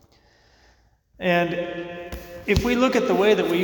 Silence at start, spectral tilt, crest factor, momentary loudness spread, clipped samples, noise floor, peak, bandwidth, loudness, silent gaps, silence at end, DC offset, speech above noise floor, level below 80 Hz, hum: 1.2 s; -5.5 dB/octave; 16 dB; 15 LU; under 0.1%; -59 dBFS; -6 dBFS; 19 kHz; -22 LUFS; none; 0 s; under 0.1%; 38 dB; -42 dBFS; none